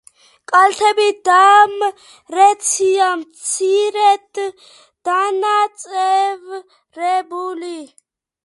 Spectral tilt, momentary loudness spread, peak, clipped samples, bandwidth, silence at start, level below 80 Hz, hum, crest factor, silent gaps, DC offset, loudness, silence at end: 0 dB/octave; 16 LU; 0 dBFS; under 0.1%; 11.5 kHz; 0.5 s; -72 dBFS; none; 16 dB; none; under 0.1%; -15 LUFS; 0.6 s